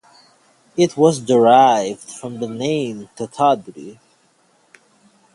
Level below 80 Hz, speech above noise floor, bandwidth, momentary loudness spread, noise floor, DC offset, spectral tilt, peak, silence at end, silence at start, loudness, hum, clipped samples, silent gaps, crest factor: -64 dBFS; 42 dB; 11.5 kHz; 19 LU; -58 dBFS; under 0.1%; -5.5 dB/octave; 0 dBFS; 1.45 s; 0.75 s; -16 LUFS; none; under 0.1%; none; 18 dB